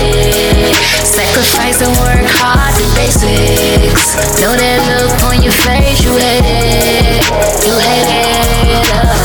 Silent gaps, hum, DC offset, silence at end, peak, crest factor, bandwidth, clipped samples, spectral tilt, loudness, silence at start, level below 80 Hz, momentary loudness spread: none; none; under 0.1%; 0 s; 0 dBFS; 8 dB; 19.5 kHz; under 0.1%; -3.5 dB/octave; -9 LUFS; 0 s; -16 dBFS; 2 LU